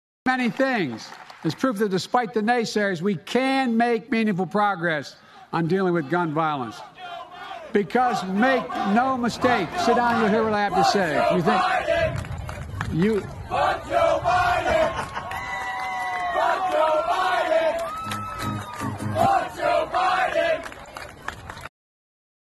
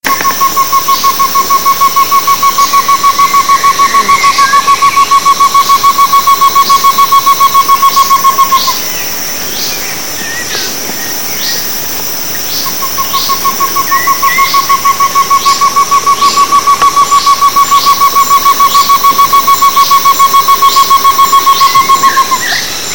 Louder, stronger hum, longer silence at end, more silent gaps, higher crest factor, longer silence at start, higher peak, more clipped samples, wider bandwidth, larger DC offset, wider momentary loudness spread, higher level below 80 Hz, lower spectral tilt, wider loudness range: second, -23 LUFS vs -6 LUFS; neither; first, 0.8 s vs 0 s; neither; first, 18 dB vs 8 dB; first, 0.25 s vs 0 s; second, -4 dBFS vs 0 dBFS; second, under 0.1% vs 2%; second, 13 kHz vs over 20 kHz; second, under 0.1% vs 5%; first, 14 LU vs 7 LU; second, -48 dBFS vs -42 dBFS; first, -5.5 dB/octave vs 0 dB/octave; second, 3 LU vs 6 LU